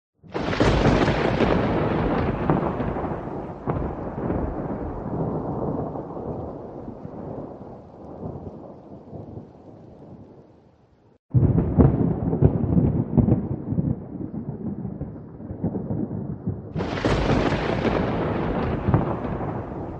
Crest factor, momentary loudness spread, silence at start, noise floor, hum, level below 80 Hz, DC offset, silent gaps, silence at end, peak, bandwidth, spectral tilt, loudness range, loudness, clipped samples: 22 dB; 19 LU; 0.25 s; -56 dBFS; none; -36 dBFS; under 0.1%; 11.19-11.29 s; 0 s; -2 dBFS; 8.4 kHz; -8 dB/octave; 16 LU; -24 LUFS; under 0.1%